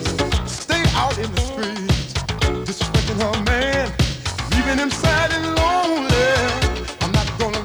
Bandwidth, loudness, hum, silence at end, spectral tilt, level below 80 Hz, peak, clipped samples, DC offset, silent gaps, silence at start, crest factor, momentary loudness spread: 20 kHz; -20 LUFS; none; 0 s; -4.5 dB/octave; -28 dBFS; -4 dBFS; under 0.1%; under 0.1%; none; 0 s; 16 dB; 6 LU